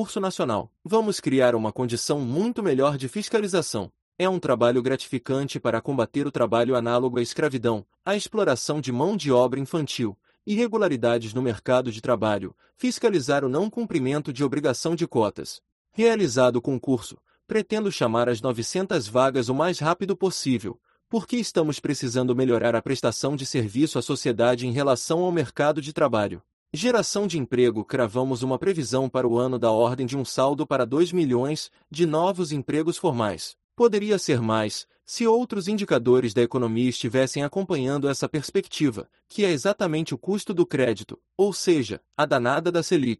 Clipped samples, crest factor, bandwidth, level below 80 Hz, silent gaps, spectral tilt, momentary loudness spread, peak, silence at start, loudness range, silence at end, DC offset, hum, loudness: under 0.1%; 16 dB; 12 kHz; -62 dBFS; 4.02-4.12 s, 15.72-15.85 s, 26.53-26.66 s, 33.64-33.69 s; -5.5 dB/octave; 7 LU; -6 dBFS; 0 s; 2 LU; 0.05 s; under 0.1%; none; -24 LUFS